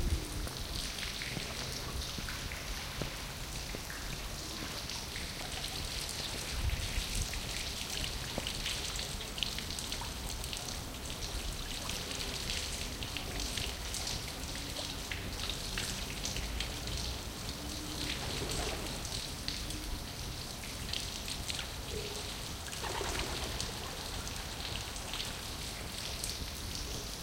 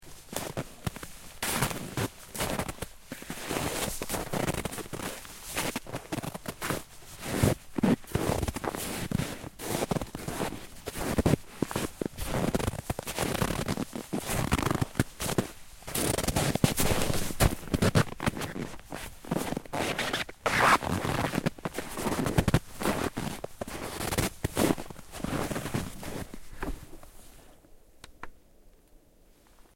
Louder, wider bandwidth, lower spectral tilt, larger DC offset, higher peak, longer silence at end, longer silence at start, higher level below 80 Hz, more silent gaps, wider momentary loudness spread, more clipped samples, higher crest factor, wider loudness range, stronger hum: second, -38 LUFS vs -31 LUFS; about the same, 17 kHz vs 16.5 kHz; second, -2.5 dB/octave vs -4.5 dB/octave; neither; second, -12 dBFS vs -6 dBFS; second, 0 s vs 0.15 s; about the same, 0 s vs 0 s; about the same, -44 dBFS vs -44 dBFS; neither; second, 4 LU vs 13 LU; neither; about the same, 26 dB vs 26 dB; second, 2 LU vs 6 LU; neither